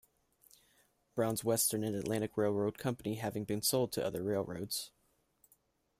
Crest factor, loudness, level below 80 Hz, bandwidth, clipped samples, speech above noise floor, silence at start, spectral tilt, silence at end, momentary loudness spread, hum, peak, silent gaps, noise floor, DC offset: 18 dB; -35 LUFS; -68 dBFS; 16 kHz; under 0.1%; 38 dB; 1.15 s; -4.5 dB/octave; 1.1 s; 8 LU; none; -20 dBFS; none; -73 dBFS; under 0.1%